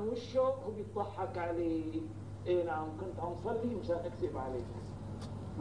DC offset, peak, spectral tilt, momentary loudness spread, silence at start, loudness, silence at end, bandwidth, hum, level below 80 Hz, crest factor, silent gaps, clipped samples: 0.1%; -22 dBFS; -8 dB/octave; 10 LU; 0 s; -38 LUFS; 0 s; 10.5 kHz; none; -56 dBFS; 16 dB; none; under 0.1%